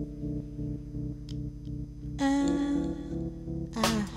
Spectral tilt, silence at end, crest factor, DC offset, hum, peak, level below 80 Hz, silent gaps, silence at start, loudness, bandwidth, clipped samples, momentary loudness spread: -5.5 dB/octave; 0 s; 20 dB; under 0.1%; none; -12 dBFS; -44 dBFS; none; 0 s; -33 LUFS; 16 kHz; under 0.1%; 12 LU